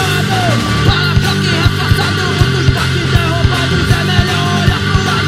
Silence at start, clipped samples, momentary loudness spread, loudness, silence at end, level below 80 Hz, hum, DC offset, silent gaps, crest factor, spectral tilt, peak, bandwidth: 0 s; under 0.1%; 1 LU; -12 LUFS; 0 s; -24 dBFS; none; under 0.1%; none; 12 dB; -5 dB/octave; 0 dBFS; 15.5 kHz